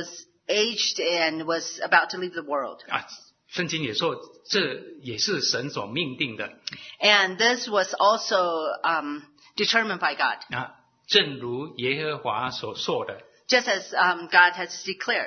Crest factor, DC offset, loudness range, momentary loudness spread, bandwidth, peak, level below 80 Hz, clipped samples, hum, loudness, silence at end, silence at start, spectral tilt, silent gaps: 24 dB; under 0.1%; 4 LU; 14 LU; 6.6 kHz; -2 dBFS; -72 dBFS; under 0.1%; none; -24 LUFS; 0 s; 0 s; -2.5 dB/octave; none